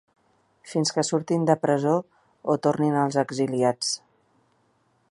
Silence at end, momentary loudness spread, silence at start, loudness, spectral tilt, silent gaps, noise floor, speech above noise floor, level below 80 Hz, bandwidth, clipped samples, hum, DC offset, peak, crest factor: 1.15 s; 6 LU; 0.65 s; -24 LUFS; -5 dB/octave; none; -67 dBFS; 43 dB; -72 dBFS; 11.5 kHz; under 0.1%; none; under 0.1%; -4 dBFS; 20 dB